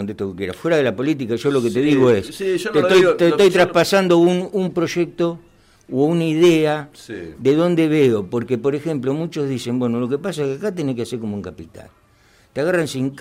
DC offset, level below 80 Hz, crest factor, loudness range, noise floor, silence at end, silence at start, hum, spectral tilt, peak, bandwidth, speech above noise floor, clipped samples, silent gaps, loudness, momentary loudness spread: under 0.1%; -56 dBFS; 14 dB; 8 LU; -54 dBFS; 0 s; 0 s; none; -6 dB/octave; -6 dBFS; 16 kHz; 36 dB; under 0.1%; none; -18 LUFS; 12 LU